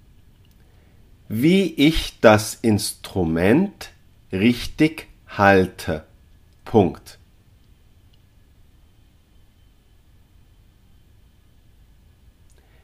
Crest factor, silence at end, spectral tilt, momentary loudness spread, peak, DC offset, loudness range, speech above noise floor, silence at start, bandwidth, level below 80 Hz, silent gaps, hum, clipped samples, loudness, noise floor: 22 dB; 5.7 s; -5.5 dB/octave; 15 LU; 0 dBFS; under 0.1%; 9 LU; 35 dB; 1.3 s; 15.5 kHz; -44 dBFS; none; none; under 0.1%; -19 LUFS; -54 dBFS